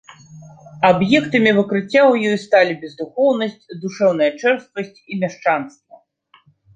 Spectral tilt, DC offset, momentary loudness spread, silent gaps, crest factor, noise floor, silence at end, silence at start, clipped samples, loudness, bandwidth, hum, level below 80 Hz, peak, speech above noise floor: -6 dB/octave; under 0.1%; 14 LU; none; 18 dB; -55 dBFS; 1.05 s; 0.3 s; under 0.1%; -17 LUFS; 9 kHz; none; -62 dBFS; -2 dBFS; 38 dB